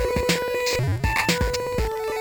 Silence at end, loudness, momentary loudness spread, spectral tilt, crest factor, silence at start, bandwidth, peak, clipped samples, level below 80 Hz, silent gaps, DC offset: 0 s; -23 LUFS; 5 LU; -4 dB/octave; 16 dB; 0 s; over 20 kHz; -8 dBFS; under 0.1%; -32 dBFS; none; under 0.1%